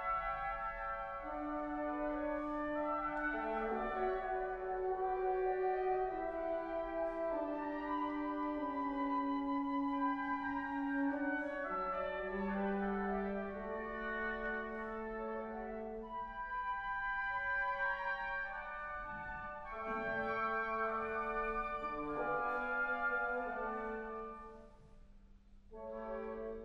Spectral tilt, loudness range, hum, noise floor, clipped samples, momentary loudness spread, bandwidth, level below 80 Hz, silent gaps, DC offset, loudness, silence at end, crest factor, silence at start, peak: -7.5 dB/octave; 3 LU; none; -60 dBFS; under 0.1%; 8 LU; 6.2 kHz; -58 dBFS; none; under 0.1%; -39 LUFS; 0 s; 14 dB; 0 s; -26 dBFS